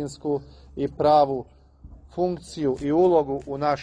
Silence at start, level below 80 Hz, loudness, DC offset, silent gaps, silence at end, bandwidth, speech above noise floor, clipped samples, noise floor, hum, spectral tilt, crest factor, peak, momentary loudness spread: 0 s; -50 dBFS; -23 LUFS; under 0.1%; none; 0 s; 10 kHz; 24 dB; under 0.1%; -47 dBFS; none; -7 dB/octave; 16 dB; -6 dBFS; 12 LU